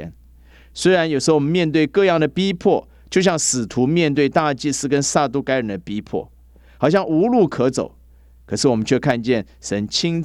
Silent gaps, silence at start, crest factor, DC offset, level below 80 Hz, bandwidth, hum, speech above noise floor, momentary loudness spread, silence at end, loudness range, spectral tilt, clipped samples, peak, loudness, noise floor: none; 0 s; 16 dB; under 0.1%; -48 dBFS; 13 kHz; none; 30 dB; 10 LU; 0 s; 3 LU; -4.5 dB/octave; under 0.1%; -2 dBFS; -19 LUFS; -48 dBFS